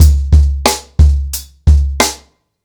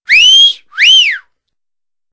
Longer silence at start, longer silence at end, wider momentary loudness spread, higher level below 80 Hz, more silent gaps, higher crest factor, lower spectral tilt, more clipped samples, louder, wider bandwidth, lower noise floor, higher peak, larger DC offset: about the same, 0 s vs 0.1 s; second, 0.5 s vs 0.95 s; about the same, 7 LU vs 9 LU; first, -12 dBFS vs -56 dBFS; neither; about the same, 10 dB vs 10 dB; first, -4.5 dB/octave vs 5 dB/octave; second, under 0.1% vs 0.7%; second, -13 LUFS vs -4 LUFS; first, over 20 kHz vs 8 kHz; second, -43 dBFS vs under -90 dBFS; about the same, 0 dBFS vs 0 dBFS; neither